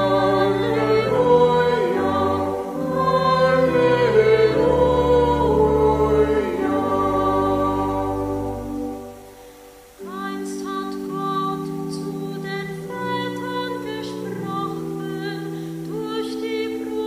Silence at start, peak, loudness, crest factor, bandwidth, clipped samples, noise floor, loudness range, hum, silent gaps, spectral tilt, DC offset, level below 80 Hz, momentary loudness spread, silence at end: 0 s; -4 dBFS; -21 LUFS; 18 dB; 15.5 kHz; under 0.1%; -44 dBFS; 11 LU; none; none; -6.5 dB/octave; under 0.1%; -40 dBFS; 12 LU; 0 s